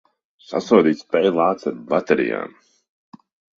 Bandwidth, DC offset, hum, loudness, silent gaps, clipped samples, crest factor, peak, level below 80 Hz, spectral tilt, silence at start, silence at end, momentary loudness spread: 7.4 kHz; under 0.1%; none; -19 LUFS; none; under 0.1%; 20 dB; -2 dBFS; -64 dBFS; -6.5 dB/octave; 0.5 s; 1.1 s; 12 LU